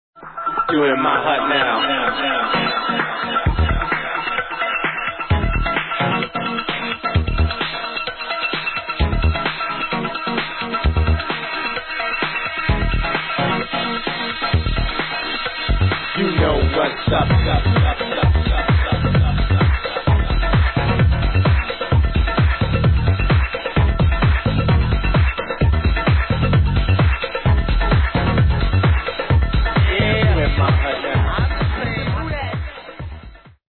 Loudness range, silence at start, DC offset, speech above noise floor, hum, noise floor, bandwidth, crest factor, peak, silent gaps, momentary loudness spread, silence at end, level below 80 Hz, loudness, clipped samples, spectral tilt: 3 LU; 0.15 s; under 0.1%; 23 dB; none; -40 dBFS; 4.4 kHz; 12 dB; -6 dBFS; none; 6 LU; 0.2 s; -22 dBFS; -18 LUFS; under 0.1%; -9.5 dB/octave